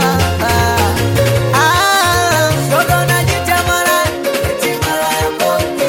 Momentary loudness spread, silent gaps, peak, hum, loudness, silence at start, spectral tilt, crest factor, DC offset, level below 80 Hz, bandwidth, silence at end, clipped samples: 5 LU; none; -2 dBFS; none; -13 LUFS; 0 s; -4 dB/octave; 12 dB; under 0.1%; -30 dBFS; 17 kHz; 0 s; under 0.1%